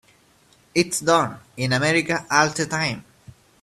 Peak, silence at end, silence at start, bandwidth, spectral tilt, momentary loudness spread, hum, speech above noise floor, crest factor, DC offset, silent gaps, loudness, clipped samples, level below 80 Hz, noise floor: -2 dBFS; 0.6 s; 0.75 s; 14 kHz; -3.5 dB/octave; 8 LU; none; 36 dB; 22 dB; under 0.1%; none; -21 LUFS; under 0.1%; -58 dBFS; -57 dBFS